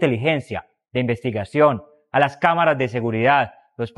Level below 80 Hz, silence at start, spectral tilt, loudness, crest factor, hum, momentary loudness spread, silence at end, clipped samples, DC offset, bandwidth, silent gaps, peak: -58 dBFS; 0 s; -7 dB/octave; -20 LUFS; 20 dB; none; 12 LU; 0.1 s; under 0.1%; under 0.1%; 11.5 kHz; none; -2 dBFS